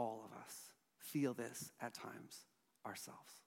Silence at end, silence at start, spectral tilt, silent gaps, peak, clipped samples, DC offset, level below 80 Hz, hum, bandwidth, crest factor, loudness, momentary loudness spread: 0.05 s; 0 s; -4.5 dB/octave; none; -28 dBFS; under 0.1%; under 0.1%; under -90 dBFS; none; 16.5 kHz; 20 dB; -48 LUFS; 15 LU